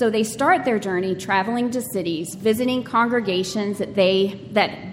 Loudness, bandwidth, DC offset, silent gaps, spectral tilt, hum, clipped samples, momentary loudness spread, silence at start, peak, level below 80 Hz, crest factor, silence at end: -21 LUFS; 16.5 kHz; under 0.1%; none; -4.5 dB/octave; none; under 0.1%; 6 LU; 0 s; -4 dBFS; -58 dBFS; 16 dB; 0 s